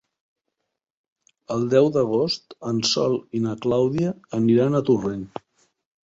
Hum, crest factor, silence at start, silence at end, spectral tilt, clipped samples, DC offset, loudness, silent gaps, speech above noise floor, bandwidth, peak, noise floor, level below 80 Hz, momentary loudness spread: none; 18 dB; 1.5 s; 0.75 s; -6 dB/octave; under 0.1%; under 0.1%; -22 LUFS; none; 59 dB; 7.8 kHz; -4 dBFS; -80 dBFS; -58 dBFS; 11 LU